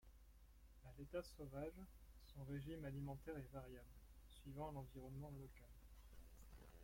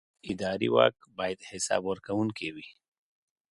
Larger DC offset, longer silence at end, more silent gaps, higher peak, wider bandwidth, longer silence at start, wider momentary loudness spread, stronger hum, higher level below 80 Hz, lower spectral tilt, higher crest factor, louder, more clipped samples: neither; second, 0 s vs 0.8 s; neither; second, -38 dBFS vs -8 dBFS; first, 16.5 kHz vs 11.5 kHz; second, 0 s vs 0.25 s; about the same, 14 LU vs 14 LU; neither; about the same, -64 dBFS vs -64 dBFS; first, -7 dB/octave vs -4 dB/octave; second, 18 dB vs 24 dB; second, -55 LUFS vs -30 LUFS; neither